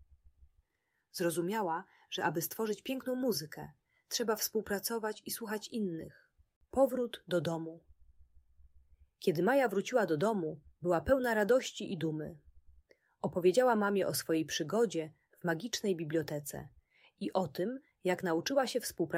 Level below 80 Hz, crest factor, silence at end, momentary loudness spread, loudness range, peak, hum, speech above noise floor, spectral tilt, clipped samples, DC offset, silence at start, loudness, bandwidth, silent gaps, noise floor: -64 dBFS; 20 dB; 0 s; 12 LU; 5 LU; -16 dBFS; none; 49 dB; -4.5 dB/octave; under 0.1%; under 0.1%; 1.15 s; -34 LUFS; 16 kHz; 6.56-6.61 s; -82 dBFS